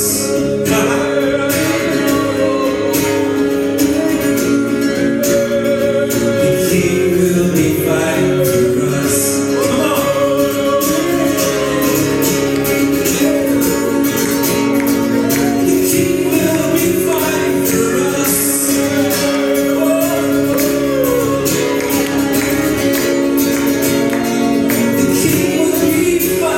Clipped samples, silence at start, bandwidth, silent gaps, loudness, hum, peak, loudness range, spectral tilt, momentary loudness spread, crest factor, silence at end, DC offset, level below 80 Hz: under 0.1%; 0 s; 17 kHz; none; -14 LUFS; none; -2 dBFS; 1 LU; -4.5 dB/octave; 2 LU; 12 dB; 0 s; under 0.1%; -42 dBFS